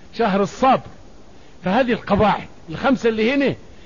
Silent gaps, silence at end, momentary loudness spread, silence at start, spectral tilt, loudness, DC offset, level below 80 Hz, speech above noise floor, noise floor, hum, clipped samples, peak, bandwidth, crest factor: none; 0.3 s; 6 LU; 0.15 s; -6.5 dB/octave; -19 LUFS; 0.8%; -44 dBFS; 28 dB; -46 dBFS; none; under 0.1%; -4 dBFS; 7.4 kHz; 16 dB